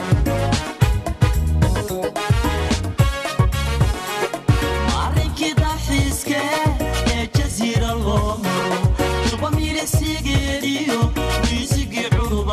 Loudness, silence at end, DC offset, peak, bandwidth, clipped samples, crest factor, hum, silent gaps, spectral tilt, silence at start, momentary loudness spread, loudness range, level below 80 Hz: -20 LUFS; 0 s; under 0.1%; -4 dBFS; 15 kHz; under 0.1%; 16 dB; none; none; -5 dB/octave; 0 s; 2 LU; 0 LU; -24 dBFS